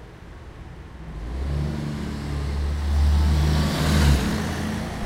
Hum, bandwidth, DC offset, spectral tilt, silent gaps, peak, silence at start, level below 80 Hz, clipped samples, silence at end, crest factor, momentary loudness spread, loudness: none; 15.5 kHz; under 0.1%; -6 dB/octave; none; -6 dBFS; 0 s; -26 dBFS; under 0.1%; 0 s; 16 dB; 21 LU; -24 LUFS